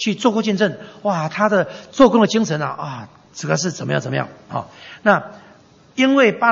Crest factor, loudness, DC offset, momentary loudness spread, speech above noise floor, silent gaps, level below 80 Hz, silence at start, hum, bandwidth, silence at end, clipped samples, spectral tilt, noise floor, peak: 18 dB; -18 LUFS; under 0.1%; 16 LU; 30 dB; none; -56 dBFS; 0 s; none; 8 kHz; 0 s; under 0.1%; -5 dB/octave; -48 dBFS; 0 dBFS